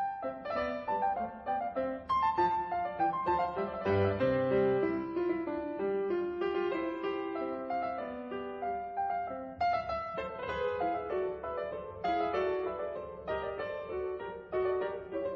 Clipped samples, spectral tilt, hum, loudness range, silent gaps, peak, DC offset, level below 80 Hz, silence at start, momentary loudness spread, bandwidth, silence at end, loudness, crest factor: under 0.1%; -5 dB/octave; none; 5 LU; none; -18 dBFS; under 0.1%; -60 dBFS; 0 s; 9 LU; 6 kHz; 0 s; -34 LUFS; 16 dB